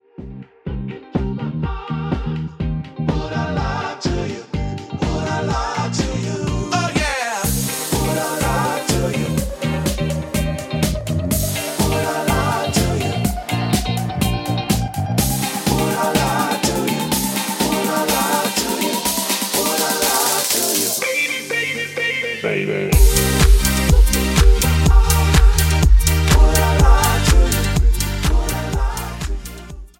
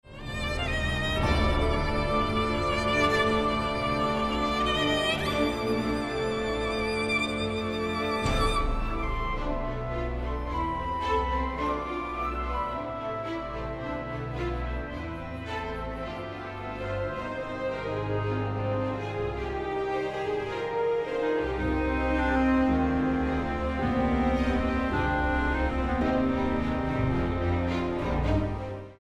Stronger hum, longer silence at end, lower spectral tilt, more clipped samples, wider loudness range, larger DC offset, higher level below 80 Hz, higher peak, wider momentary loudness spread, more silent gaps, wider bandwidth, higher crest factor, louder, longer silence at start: neither; about the same, 0.1 s vs 0.05 s; second, -4 dB/octave vs -6 dB/octave; neither; about the same, 8 LU vs 7 LU; neither; first, -20 dBFS vs -36 dBFS; first, -2 dBFS vs -12 dBFS; about the same, 10 LU vs 9 LU; neither; first, 17 kHz vs 13 kHz; about the same, 16 dB vs 16 dB; first, -18 LUFS vs -29 LUFS; first, 0.2 s vs 0.05 s